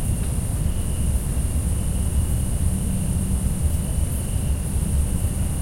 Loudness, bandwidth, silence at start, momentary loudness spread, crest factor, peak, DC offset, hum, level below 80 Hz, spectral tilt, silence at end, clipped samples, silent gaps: -24 LUFS; 16.5 kHz; 0 s; 2 LU; 14 dB; -8 dBFS; under 0.1%; none; -24 dBFS; -6 dB/octave; 0 s; under 0.1%; none